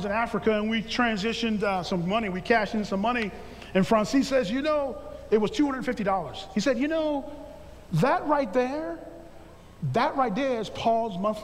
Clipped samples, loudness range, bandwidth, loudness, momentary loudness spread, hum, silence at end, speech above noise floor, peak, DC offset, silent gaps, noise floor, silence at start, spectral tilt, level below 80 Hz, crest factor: under 0.1%; 2 LU; 14.5 kHz; -26 LUFS; 11 LU; none; 0 s; 22 dB; -10 dBFS; under 0.1%; none; -48 dBFS; 0 s; -5.5 dB/octave; -50 dBFS; 18 dB